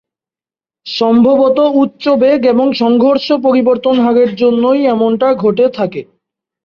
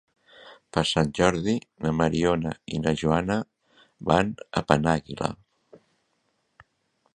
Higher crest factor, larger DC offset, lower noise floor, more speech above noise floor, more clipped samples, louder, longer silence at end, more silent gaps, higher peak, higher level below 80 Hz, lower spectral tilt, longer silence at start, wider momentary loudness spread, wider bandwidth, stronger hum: second, 10 dB vs 26 dB; neither; first, under -90 dBFS vs -73 dBFS; first, over 80 dB vs 48 dB; neither; first, -11 LUFS vs -25 LUFS; second, 0.65 s vs 1.8 s; neither; about the same, 0 dBFS vs 0 dBFS; second, -56 dBFS vs -48 dBFS; first, -7.5 dB/octave vs -5.5 dB/octave; first, 0.85 s vs 0.45 s; second, 4 LU vs 9 LU; second, 6.6 kHz vs 10.5 kHz; neither